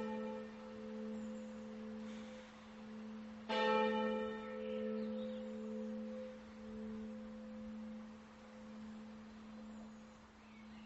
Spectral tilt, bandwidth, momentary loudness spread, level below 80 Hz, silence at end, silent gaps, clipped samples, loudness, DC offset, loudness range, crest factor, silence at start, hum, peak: -3.5 dB/octave; 8 kHz; 17 LU; -72 dBFS; 0 s; none; under 0.1%; -45 LUFS; under 0.1%; 11 LU; 22 dB; 0 s; none; -24 dBFS